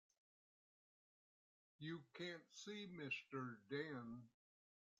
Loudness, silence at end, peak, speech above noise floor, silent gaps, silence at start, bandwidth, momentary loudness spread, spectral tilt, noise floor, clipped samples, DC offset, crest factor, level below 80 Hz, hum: -52 LUFS; 0.7 s; -34 dBFS; over 38 dB; none; 1.8 s; 8.8 kHz; 8 LU; -5 dB/octave; under -90 dBFS; under 0.1%; under 0.1%; 20 dB; under -90 dBFS; none